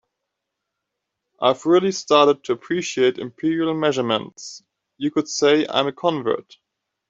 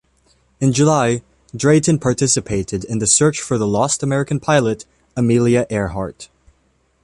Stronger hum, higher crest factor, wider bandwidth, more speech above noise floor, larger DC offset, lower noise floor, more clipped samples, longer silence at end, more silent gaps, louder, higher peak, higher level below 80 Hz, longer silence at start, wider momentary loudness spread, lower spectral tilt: neither; about the same, 18 dB vs 18 dB; second, 7.8 kHz vs 11.5 kHz; first, 61 dB vs 45 dB; neither; first, -81 dBFS vs -61 dBFS; neither; about the same, 0.7 s vs 0.8 s; neither; second, -20 LUFS vs -17 LUFS; about the same, -2 dBFS vs 0 dBFS; second, -68 dBFS vs -44 dBFS; first, 1.4 s vs 0.6 s; about the same, 9 LU vs 11 LU; about the same, -4.5 dB/octave vs -5 dB/octave